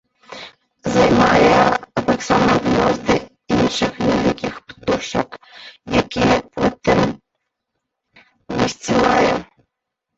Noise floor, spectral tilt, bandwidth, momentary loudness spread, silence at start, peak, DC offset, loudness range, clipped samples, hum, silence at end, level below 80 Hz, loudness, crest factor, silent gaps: -79 dBFS; -5 dB/octave; 8.2 kHz; 16 LU; 0.3 s; -2 dBFS; under 0.1%; 5 LU; under 0.1%; none; 0.75 s; -42 dBFS; -17 LUFS; 16 dB; none